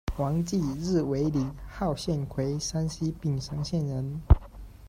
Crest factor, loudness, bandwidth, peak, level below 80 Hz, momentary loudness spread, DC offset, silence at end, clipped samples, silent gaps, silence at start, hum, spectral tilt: 22 dB; -29 LUFS; 15.5 kHz; -6 dBFS; -34 dBFS; 7 LU; under 0.1%; 0 s; under 0.1%; none; 0.05 s; none; -6.5 dB/octave